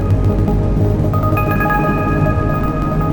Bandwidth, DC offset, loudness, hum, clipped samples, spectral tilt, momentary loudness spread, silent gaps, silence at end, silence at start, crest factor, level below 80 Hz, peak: 18 kHz; under 0.1%; -16 LUFS; none; under 0.1%; -9 dB/octave; 3 LU; none; 0 s; 0 s; 12 dB; -22 dBFS; -2 dBFS